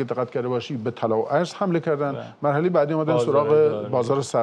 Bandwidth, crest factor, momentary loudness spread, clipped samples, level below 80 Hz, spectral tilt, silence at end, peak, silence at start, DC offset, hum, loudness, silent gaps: 10 kHz; 14 dB; 8 LU; under 0.1%; -70 dBFS; -7 dB/octave; 0 s; -8 dBFS; 0 s; under 0.1%; none; -22 LUFS; none